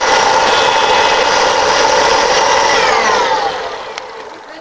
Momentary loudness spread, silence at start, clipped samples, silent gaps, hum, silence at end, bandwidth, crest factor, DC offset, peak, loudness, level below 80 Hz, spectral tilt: 15 LU; 0 s; under 0.1%; none; none; 0 s; 8 kHz; 12 dB; under 0.1%; 0 dBFS; -11 LUFS; -42 dBFS; -1 dB/octave